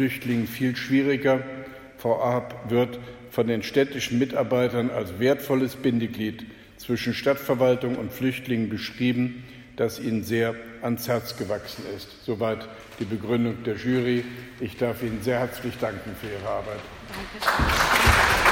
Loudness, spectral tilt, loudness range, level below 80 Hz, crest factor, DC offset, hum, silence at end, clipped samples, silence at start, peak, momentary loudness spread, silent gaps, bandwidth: -25 LUFS; -5 dB/octave; 4 LU; -42 dBFS; 20 dB; under 0.1%; none; 0 s; under 0.1%; 0 s; -4 dBFS; 13 LU; none; 17 kHz